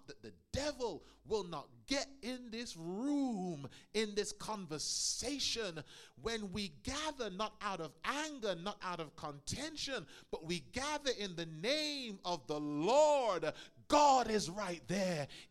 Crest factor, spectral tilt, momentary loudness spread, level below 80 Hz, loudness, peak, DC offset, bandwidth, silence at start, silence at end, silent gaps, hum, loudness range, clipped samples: 22 dB; -3.5 dB/octave; 13 LU; -62 dBFS; -38 LUFS; -16 dBFS; under 0.1%; 15 kHz; 0.1 s; 0.05 s; none; none; 8 LU; under 0.1%